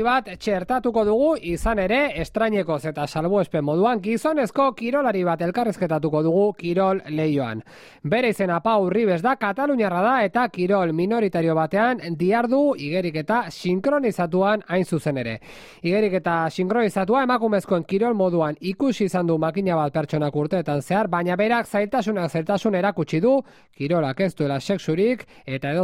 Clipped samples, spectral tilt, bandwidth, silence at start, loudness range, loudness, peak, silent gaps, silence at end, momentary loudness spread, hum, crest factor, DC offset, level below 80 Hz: under 0.1%; -7 dB/octave; 15 kHz; 0 s; 2 LU; -22 LUFS; -8 dBFS; none; 0 s; 5 LU; none; 14 dB; under 0.1%; -48 dBFS